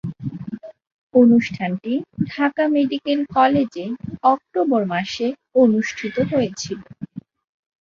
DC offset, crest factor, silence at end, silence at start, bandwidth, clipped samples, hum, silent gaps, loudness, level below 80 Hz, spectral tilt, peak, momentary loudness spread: under 0.1%; 18 dB; 0.65 s; 0.05 s; 7.4 kHz; under 0.1%; none; 0.92-1.10 s; -20 LUFS; -56 dBFS; -6 dB/octave; -2 dBFS; 17 LU